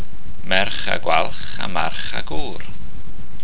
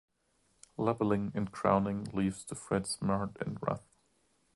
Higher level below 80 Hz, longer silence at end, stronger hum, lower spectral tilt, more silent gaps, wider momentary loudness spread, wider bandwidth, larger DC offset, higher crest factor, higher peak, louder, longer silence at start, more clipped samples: first, -40 dBFS vs -60 dBFS; second, 0 s vs 0.75 s; neither; first, -7.5 dB/octave vs -6 dB/octave; neither; first, 21 LU vs 8 LU; second, 4 kHz vs 11.5 kHz; first, 20% vs under 0.1%; about the same, 22 dB vs 22 dB; first, 0 dBFS vs -12 dBFS; first, -23 LUFS vs -34 LUFS; second, 0 s vs 0.8 s; neither